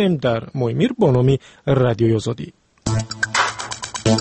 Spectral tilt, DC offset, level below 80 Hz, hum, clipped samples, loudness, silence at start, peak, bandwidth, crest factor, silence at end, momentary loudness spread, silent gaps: -5.5 dB/octave; under 0.1%; -44 dBFS; none; under 0.1%; -19 LUFS; 0 s; -4 dBFS; 8.8 kHz; 14 dB; 0 s; 11 LU; none